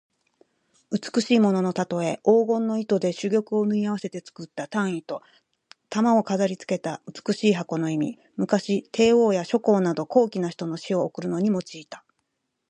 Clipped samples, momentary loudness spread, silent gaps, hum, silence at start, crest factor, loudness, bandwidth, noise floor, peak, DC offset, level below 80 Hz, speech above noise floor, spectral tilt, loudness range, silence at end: under 0.1%; 13 LU; none; none; 0.9 s; 18 dB; -24 LUFS; 9.8 kHz; -77 dBFS; -6 dBFS; under 0.1%; -68 dBFS; 54 dB; -6 dB/octave; 4 LU; 0.7 s